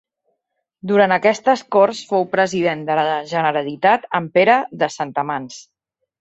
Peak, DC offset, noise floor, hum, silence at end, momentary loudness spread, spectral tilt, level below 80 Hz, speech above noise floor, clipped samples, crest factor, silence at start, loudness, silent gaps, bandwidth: -2 dBFS; under 0.1%; -74 dBFS; none; 0.6 s; 9 LU; -5 dB/octave; -66 dBFS; 57 dB; under 0.1%; 18 dB; 0.85 s; -18 LUFS; none; 8.2 kHz